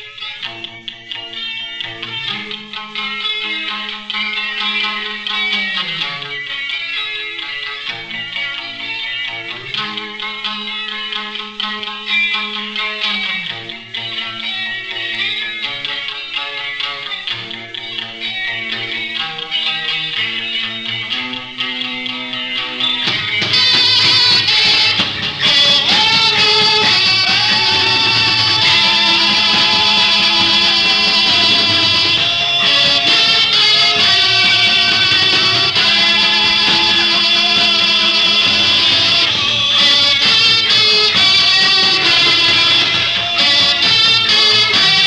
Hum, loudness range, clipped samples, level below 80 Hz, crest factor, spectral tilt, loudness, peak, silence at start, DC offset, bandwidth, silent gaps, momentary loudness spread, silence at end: none; 12 LU; under 0.1%; -52 dBFS; 12 dB; -1.5 dB/octave; -11 LUFS; -2 dBFS; 0 s; under 0.1%; 13 kHz; none; 13 LU; 0 s